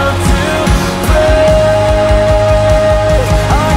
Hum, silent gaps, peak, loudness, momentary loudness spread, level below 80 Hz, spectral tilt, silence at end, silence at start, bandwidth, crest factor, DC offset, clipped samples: none; none; 0 dBFS; -10 LUFS; 3 LU; -16 dBFS; -5.5 dB/octave; 0 s; 0 s; 16 kHz; 10 dB; under 0.1%; under 0.1%